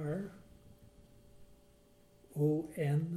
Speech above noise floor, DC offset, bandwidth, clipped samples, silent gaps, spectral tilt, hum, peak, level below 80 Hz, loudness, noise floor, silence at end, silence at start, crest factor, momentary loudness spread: 30 dB; under 0.1%; 13.5 kHz; under 0.1%; none; -9 dB/octave; none; -22 dBFS; -66 dBFS; -36 LUFS; -64 dBFS; 0 s; 0 s; 16 dB; 15 LU